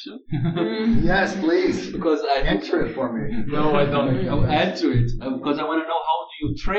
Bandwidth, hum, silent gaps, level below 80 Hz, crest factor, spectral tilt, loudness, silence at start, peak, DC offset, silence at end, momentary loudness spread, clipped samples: 7.8 kHz; none; none; -32 dBFS; 14 dB; -7 dB/octave; -22 LUFS; 0 s; -6 dBFS; under 0.1%; 0 s; 6 LU; under 0.1%